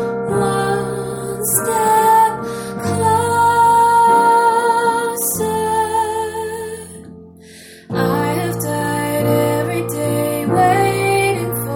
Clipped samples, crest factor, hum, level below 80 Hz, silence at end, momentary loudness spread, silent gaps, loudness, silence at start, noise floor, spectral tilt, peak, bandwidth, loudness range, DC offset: under 0.1%; 16 dB; none; -48 dBFS; 0 s; 12 LU; none; -16 LUFS; 0 s; -40 dBFS; -4.5 dB/octave; 0 dBFS; 18 kHz; 8 LU; under 0.1%